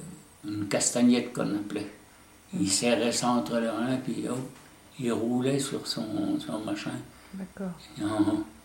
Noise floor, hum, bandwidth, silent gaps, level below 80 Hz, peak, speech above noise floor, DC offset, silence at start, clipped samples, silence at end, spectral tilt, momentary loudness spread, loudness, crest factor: -54 dBFS; none; 16.5 kHz; none; -64 dBFS; -10 dBFS; 26 dB; under 0.1%; 0 s; under 0.1%; 0.05 s; -4 dB/octave; 16 LU; -29 LUFS; 20 dB